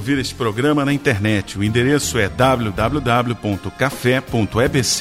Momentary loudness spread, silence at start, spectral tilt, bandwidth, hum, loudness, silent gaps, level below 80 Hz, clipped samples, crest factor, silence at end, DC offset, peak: 5 LU; 0 s; -5 dB/octave; 16 kHz; none; -18 LUFS; none; -38 dBFS; under 0.1%; 16 dB; 0 s; under 0.1%; -2 dBFS